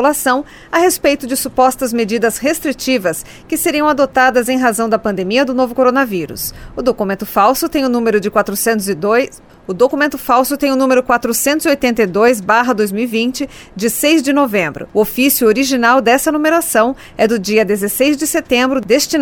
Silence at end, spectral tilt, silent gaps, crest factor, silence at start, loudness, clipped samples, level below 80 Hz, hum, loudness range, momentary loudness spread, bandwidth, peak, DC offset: 0 s; -3.5 dB/octave; none; 14 dB; 0 s; -14 LUFS; under 0.1%; -44 dBFS; none; 2 LU; 7 LU; 19.5 kHz; 0 dBFS; under 0.1%